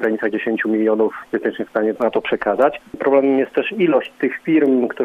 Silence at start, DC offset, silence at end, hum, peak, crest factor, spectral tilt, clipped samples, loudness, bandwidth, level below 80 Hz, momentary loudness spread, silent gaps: 0 s; under 0.1%; 0 s; none; -2 dBFS; 16 dB; -7.5 dB/octave; under 0.1%; -18 LUFS; 4.9 kHz; -60 dBFS; 7 LU; none